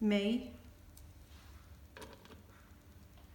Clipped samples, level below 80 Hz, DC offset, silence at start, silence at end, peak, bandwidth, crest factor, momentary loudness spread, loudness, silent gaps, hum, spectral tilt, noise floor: under 0.1%; -60 dBFS; under 0.1%; 0 s; 0 s; -20 dBFS; 19 kHz; 22 dB; 24 LU; -37 LUFS; none; none; -6 dB/octave; -59 dBFS